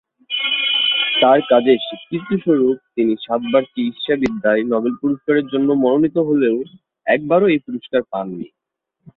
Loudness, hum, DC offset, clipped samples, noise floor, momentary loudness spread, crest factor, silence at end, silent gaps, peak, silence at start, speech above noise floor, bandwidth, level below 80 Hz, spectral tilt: -17 LUFS; none; under 0.1%; under 0.1%; -76 dBFS; 11 LU; 16 dB; 0.7 s; none; -2 dBFS; 0.3 s; 59 dB; 6.8 kHz; -58 dBFS; -7 dB/octave